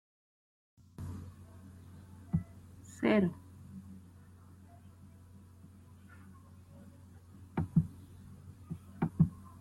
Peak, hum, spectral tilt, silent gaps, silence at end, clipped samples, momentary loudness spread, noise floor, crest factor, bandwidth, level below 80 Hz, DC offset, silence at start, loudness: -16 dBFS; none; -8 dB/octave; none; 0 s; under 0.1%; 26 LU; -56 dBFS; 24 dB; 12.5 kHz; -62 dBFS; under 0.1%; 1 s; -35 LUFS